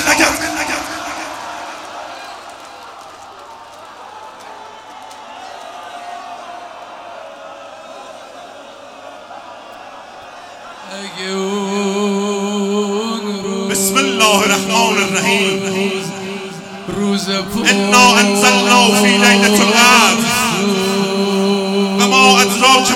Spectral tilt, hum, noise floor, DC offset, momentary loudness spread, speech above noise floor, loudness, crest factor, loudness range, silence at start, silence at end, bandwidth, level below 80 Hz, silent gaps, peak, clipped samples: -3 dB/octave; none; -35 dBFS; under 0.1%; 25 LU; 24 dB; -12 LUFS; 16 dB; 24 LU; 0 s; 0 s; 17 kHz; -52 dBFS; none; 0 dBFS; under 0.1%